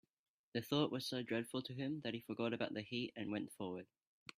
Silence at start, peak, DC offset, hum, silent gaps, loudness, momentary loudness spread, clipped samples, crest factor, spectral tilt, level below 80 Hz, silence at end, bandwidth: 0.55 s; -22 dBFS; under 0.1%; none; none; -43 LUFS; 9 LU; under 0.1%; 22 dB; -5.5 dB/octave; -82 dBFS; 0.55 s; 15.5 kHz